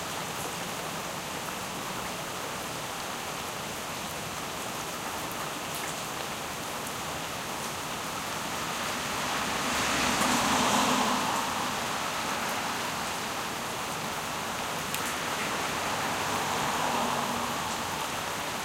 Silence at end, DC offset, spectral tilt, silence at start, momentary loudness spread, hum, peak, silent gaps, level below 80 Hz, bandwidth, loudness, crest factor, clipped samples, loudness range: 0 s; under 0.1%; -2 dB/octave; 0 s; 9 LU; none; -10 dBFS; none; -56 dBFS; 16.5 kHz; -30 LUFS; 22 dB; under 0.1%; 7 LU